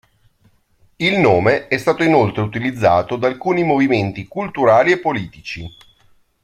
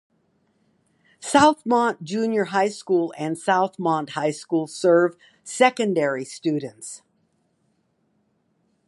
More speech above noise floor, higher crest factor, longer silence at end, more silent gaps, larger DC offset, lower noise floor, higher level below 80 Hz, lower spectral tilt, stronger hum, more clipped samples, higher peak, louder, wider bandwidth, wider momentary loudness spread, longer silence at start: second, 41 dB vs 47 dB; second, 16 dB vs 22 dB; second, 0.75 s vs 1.9 s; neither; neither; second, -57 dBFS vs -68 dBFS; first, -50 dBFS vs -66 dBFS; first, -6.5 dB/octave vs -4.5 dB/octave; neither; neither; about the same, 0 dBFS vs -2 dBFS; first, -16 LUFS vs -22 LUFS; first, 13.5 kHz vs 11.5 kHz; second, 13 LU vs 17 LU; second, 1 s vs 1.2 s